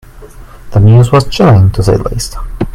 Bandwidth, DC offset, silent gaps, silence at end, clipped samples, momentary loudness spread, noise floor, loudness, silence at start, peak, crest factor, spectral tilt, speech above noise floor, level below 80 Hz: 13.5 kHz; under 0.1%; none; 0 s; 0.8%; 13 LU; -31 dBFS; -9 LUFS; 0.15 s; 0 dBFS; 8 dB; -7 dB/octave; 24 dB; -24 dBFS